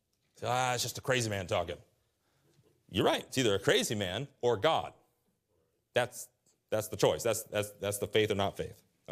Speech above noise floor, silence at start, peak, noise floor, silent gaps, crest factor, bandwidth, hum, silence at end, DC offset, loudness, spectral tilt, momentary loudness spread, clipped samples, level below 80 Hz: 45 dB; 0.4 s; -12 dBFS; -76 dBFS; none; 22 dB; 15.5 kHz; none; 0 s; under 0.1%; -32 LUFS; -4 dB/octave; 12 LU; under 0.1%; -68 dBFS